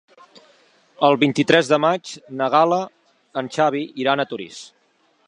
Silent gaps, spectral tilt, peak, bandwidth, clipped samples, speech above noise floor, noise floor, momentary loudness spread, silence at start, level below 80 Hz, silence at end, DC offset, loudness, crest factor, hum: none; -5 dB/octave; 0 dBFS; 10.5 kHz; under 0.1%; 43 dB; -62 dBFS; 16 LU; 1 s; -74 dBFS; 0.6 s; under 0.1%; -19 LUFS; 20 dB; none